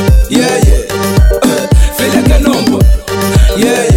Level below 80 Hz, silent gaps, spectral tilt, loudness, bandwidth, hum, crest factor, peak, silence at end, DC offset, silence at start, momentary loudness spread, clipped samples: -10 dBFS; none; -5.5 dB/octave; -10 LUFS; 16.5 kHz; none; 8 dB; 0 dBFS; 0 s; under 0.1%; 0 s; 2 LU; 0.4%